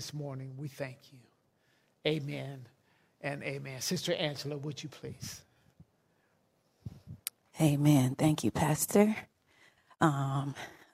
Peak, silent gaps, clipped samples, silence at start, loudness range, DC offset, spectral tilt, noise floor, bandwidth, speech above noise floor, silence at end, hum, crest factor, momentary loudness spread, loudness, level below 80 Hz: -10 dBFS; none; under 0.1%; 0 s; 11 LU; under 0.1%; -5.5 dB/octave; -73 dBFS; 16 kHz; 41 dB; 0.2 s; none; 24 dB; 18 LU; -32 LUFS; -64 dBFS